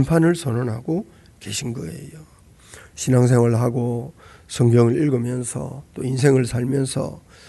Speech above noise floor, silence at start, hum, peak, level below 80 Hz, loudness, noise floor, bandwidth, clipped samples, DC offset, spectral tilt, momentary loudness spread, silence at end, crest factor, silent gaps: 26 dB; 0 s; none; -2 dBFS; -50 dBFS; -20 LUFS; -46 dBFS; 12 kHz; under 0.1%; under 0.1%; -6.5 dB/octave; 17 LU; 0.3 s; 18 dB; none